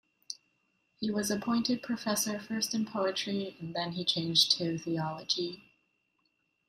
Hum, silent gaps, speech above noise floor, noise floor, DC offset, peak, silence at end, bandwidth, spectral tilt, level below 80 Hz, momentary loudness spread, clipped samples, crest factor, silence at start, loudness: none; none; 45 dB; -77 dBFS; under 0.1%; -10 dBFS; 1.1 s; 15.5 kHz; -3.5 dB/octave; -72 dBFS; 13 LU; under 0.1%; 24 dB; 0.3 s; -31 LUFS